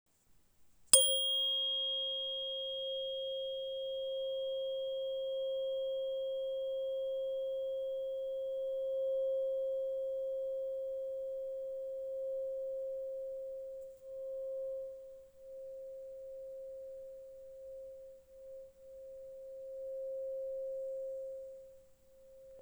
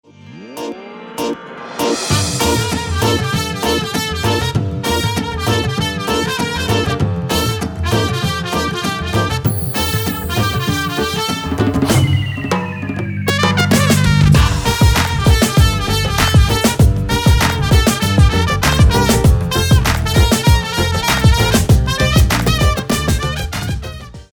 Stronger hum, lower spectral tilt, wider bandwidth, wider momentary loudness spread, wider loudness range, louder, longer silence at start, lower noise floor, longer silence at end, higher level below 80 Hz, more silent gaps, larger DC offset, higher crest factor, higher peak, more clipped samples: neither; second, 1.5 dB/octave vs -4.5 dB/octave; about the same, over 20 kHz vs over 20 kHz; first, 18 LU vs 8 LU; first, 16 LU vs 5 LU; second, -36 LUFS vs -15 LUFS; about the same, 0.3 s vs 0.25 s; first, -68 dBFS vs -35 dBFS; second, 0 s vs 0.15 s; second, -74 dBFS vs -22 dBFS; neither; neither; first, 34 dB vs 14 dB; second, -6 dBFS vs 0 dBFS; neither